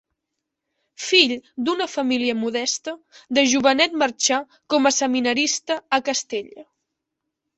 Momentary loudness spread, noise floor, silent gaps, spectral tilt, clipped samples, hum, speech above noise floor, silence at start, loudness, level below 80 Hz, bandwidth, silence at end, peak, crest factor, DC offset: 10 LU; -81 dBFS; none; -1 dB/octave; under 0.1%; none; 60 dB; 1 s; -20 LUFS; -68 dBFS; 8.2 kHz; 0.95 s; 0 dBFS; 22 dB; under 0.1%